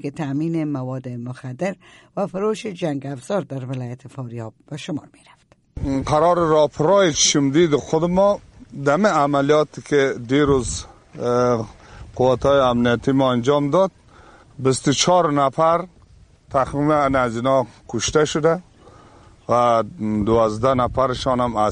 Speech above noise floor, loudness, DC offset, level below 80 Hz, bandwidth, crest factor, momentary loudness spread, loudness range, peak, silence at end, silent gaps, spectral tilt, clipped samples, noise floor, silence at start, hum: 31 dB; -19 LUFS; under 0.1%; -44 dBFS; 11.5 kHz; 16 dB; 15 LU; 9 LU; -4 dBFS; 0 s; none; -5 dB/octave; under 0.1%; -50 dBFS; 0.05 s; none